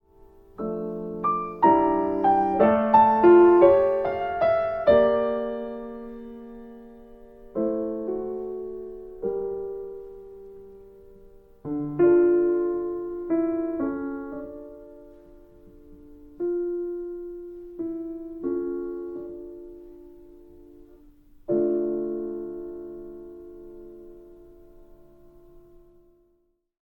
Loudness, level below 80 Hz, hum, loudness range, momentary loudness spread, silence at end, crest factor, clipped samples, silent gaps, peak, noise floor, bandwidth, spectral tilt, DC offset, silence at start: -23 LUFS; -54 dBFS; none; 16 LU; 25 LU; 2.5 s; 20 dB; under 0.1%; none; -6 dBFS; -69 dBFS; 4.5 kHz; -9.5 dB/octave; under 0.1%; 0.6 s